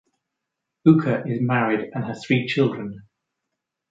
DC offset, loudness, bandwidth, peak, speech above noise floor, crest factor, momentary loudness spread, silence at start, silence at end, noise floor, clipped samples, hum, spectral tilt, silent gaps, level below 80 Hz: under 0.1%; -21 LUFS; 7.8 kHz; -2 dBFS; 61 dB; 20 dB; 12 LU; 0.85 s; 0.9 s; -82 dBFS; under 0.1%; none; -8 dB/octave; none; -64 dBFS